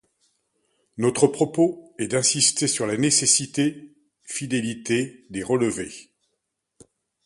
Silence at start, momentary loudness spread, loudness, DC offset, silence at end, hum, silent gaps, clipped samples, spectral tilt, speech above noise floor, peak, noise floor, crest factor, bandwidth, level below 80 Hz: 0.95 s; 14 LU; -22 LUFS; under 0.1%; 1.25 s; none; none; under 0.1%; -3 dB/octave; 55 dB; -2 dBFS; -78 dBFS; 22 dB; 11.5 kHz; -62 dBFS